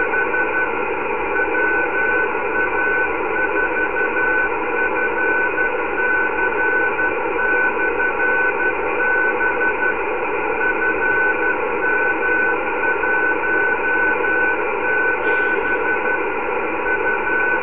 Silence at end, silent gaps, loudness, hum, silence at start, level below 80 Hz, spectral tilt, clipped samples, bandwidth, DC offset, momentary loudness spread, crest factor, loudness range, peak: 0 s; none; -18 LUFS; none; 0 s; -46 dBFS; -7.5 dB/octave; under 0.1%; 3.9 kHz; 3%; 3 LU; 12 dB; 1 LU; -6 dBFS